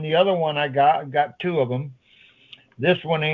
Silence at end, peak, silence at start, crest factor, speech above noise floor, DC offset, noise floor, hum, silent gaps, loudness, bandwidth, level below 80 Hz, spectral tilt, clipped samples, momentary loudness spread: 0 s; -6 dBFS; 0 s; 18 dB; 34 dB; under 0.1%; -54 dBFS; none; none; -21 LUFS; 5 kHz; -68 dBFS; -8.5 dB/octave; under 0.1%; 7 LU